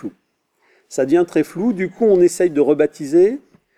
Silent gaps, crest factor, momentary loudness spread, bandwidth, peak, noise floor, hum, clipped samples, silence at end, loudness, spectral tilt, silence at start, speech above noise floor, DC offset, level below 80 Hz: none; 14 dB; 10 LU; 13 kHz; -4 dBFS; -65 dBFS; none; under 0.1%; 0.4 s; -16 LUFS; -6.5 dB/octave; 0.05 s; 50 dB; under 0.1%; -62 dBFS